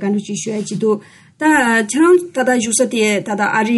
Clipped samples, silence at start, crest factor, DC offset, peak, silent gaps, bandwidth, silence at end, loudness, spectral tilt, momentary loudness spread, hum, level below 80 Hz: under 0.1%; 0 s; 14 dB; under 0.1%; -2 dBFS; none; 11.5 kHz; 0 s; -15 LUFS; -4 dB/octave; 9 LU; none; -62 dBFS